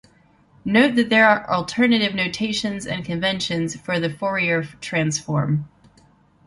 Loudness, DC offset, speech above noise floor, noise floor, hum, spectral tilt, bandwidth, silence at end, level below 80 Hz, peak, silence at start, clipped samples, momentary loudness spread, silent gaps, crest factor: -20 LUFS; under 0.1%; 35 dB; -56 dBFS; none; -5 dB/octave; 11.5 kHz; 0.8 s; -56 dBFS; -2 dBFS; 0.65 s; under 0.1%; 10 LU; none; 20 dB